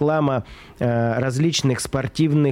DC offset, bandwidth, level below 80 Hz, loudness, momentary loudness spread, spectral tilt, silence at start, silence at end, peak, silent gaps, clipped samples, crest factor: under 0.1%; 15.5 kHz; -48 dBFS; -21 LUFS; 7 LU; -6 dB/octave; 0 s; 0 s; -8 dBFS; none; under 0.1%; 12 dB